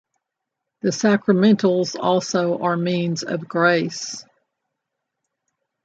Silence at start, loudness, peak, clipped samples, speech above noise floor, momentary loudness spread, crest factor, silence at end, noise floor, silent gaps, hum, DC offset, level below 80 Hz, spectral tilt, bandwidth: 0.85 s; -20 LUFS; -4 dBFS; under 0.1%; 62 dB; 10 LU; 18 dB; 1.65 s; -82 dBFS; none; none; under 0.1%; -68 dBFS; -5.5 dB/octave; 8 kHz